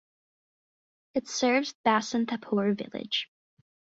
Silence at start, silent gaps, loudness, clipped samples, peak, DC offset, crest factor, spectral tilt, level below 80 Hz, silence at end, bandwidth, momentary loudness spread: 1.15 s; 1.75-1.84 s; -28 LUFS; under 0.1%; -10 dBFS; under 0.1%; 20 dB; -4 dB/octave; -74 dBFS; 0.75 s; 8 kHz; 9 LU